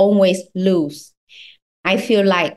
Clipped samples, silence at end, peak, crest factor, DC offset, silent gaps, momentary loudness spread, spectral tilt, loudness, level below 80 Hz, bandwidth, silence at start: under 0.1%; 0.05 s; -2 dBFS; 14 dB; under 0.1%; 1.17-1.27 s, 1.62-1.84 s; 11 LU; -6 dB/octave; -17 LUFS; -64 dBFS; 12.5 kHz; 0 s